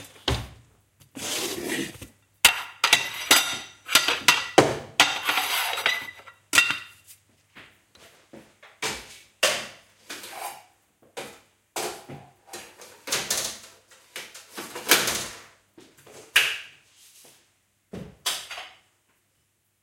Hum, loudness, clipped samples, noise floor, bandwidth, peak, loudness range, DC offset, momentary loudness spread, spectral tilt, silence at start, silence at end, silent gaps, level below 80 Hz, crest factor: none; -23 LUFS; under 0.1%; -71 dBFS; 17 kHz; 0 dBFS; 12 LU; under 0.1%; 23 LU; -1 dB/octave; 0 s; 1.15 s; none; -52 dBFS; 28 dB